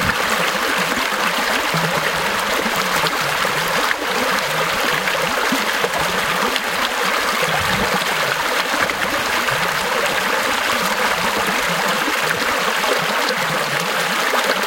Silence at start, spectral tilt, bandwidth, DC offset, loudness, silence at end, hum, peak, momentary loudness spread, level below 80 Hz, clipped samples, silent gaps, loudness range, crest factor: 0 s; -2 dB/octave; 17 kHz; under 0.1%; -17 LUFS; 0 s; none; 0 dBFS; 1 LU; -48 dBFS; under 0.1%; none; 0 LU; 18 dB